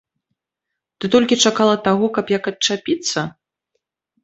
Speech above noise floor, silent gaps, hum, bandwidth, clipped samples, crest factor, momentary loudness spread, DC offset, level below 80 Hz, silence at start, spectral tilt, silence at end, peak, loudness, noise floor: 64 dB; none; none; 8.2 kHz; under 0.1%; 18 dB; 9 LU; under 0.1%; -60 dBFS; 1 s; -3.5 dB/octave; 0.95 s; -2 dBFS; -17 LUFS; -82 dBFS